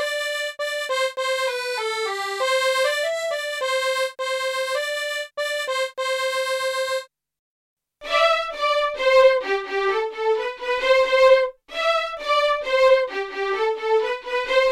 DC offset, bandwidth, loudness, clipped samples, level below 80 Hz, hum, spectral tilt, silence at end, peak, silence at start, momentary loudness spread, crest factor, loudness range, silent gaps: under 0.1%; 15 kHz; -21 LUFS; under 0.1%; -56 dBFS; none; 0.5 dB/octave; 0 s; -4 dBFS; 0 s; 9 LU; 18 dB; 5 LU; 7.39-7.77 s